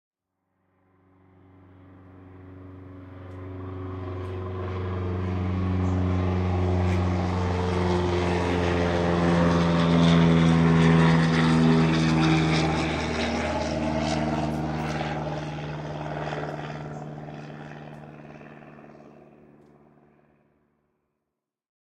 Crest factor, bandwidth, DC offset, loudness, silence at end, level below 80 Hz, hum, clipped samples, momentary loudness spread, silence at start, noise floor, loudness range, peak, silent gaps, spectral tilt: 18 dB; 9.2 kHz; under 0.1%; -24 LUFS; 2.75 s; -48 dBFS; none; under 0.1%; 22 LU; 2.15 s; -84 dBFS; 20 LU; -8 dBFS; none; -7 dB/octave